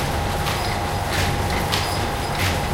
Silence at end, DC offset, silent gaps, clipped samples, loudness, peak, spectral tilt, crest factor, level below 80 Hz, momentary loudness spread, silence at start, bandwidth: 0 s; under 0.1%; none; under 0.1%; -22 LUFS; -2 dBFS; -4 dB/octave; 20 dB; -32 dBFS; 2 LU; 0 s; 17 kHz